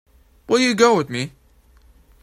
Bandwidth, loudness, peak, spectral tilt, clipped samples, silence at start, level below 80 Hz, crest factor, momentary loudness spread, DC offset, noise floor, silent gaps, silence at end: 15.5 kHz; -18 LUFS; 0 dBFS; -4 dB/octave; under 0.1%; 0.5 s; -54 dBFS; 22 dB; 13 LU; under 0.1%; -53 dBFS; none; 0.95 s